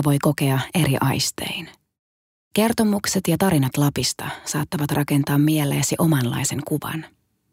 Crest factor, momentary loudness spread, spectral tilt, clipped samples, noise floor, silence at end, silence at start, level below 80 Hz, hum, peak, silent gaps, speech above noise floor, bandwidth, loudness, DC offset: 16 dB; 9 LU; -5 dB/octave; under 0.1%; under -90 dBFS; 0.45 s; 0 s; -52 dBFS; none; -6 dBFS; 1.99-2.51 s; over 69 dB; 16 kHz; -21 LUFS; under 0.1%